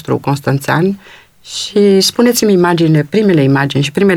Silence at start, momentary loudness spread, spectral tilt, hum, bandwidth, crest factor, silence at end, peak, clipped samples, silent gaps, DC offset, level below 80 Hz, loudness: 0.05 s; 7 LU; -5.5 dB/octave; none; 18 kHz; 10 dB; 0 s; 0 dBFS; under 0.1%; none; under 0.1%; -52 dBFS; -12 LUFS